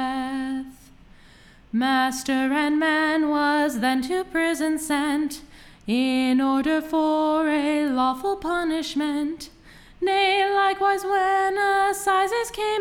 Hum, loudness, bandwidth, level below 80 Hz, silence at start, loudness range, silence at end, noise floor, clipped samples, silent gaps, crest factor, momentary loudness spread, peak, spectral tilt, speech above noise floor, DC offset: none; -23 LUFS; 17 kHz; -54 dBFS; 0 s; 2 LU; 0 s; -50 dBFS; under 0.1%; none; 14 dB; 8 LU; -10 dBFS; -3 dB/octave; 28 dB; under 0.1%